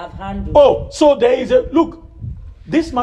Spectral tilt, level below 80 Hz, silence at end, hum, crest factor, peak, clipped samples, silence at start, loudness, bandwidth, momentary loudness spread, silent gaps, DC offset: -6 dB/octave; -34 dBFS; 0 s; none; 14 dB; 0 dBFS; under 0.1%; 0 s; -14 LUFS; 10.5 kHz; 20 LU; none; under 0.1%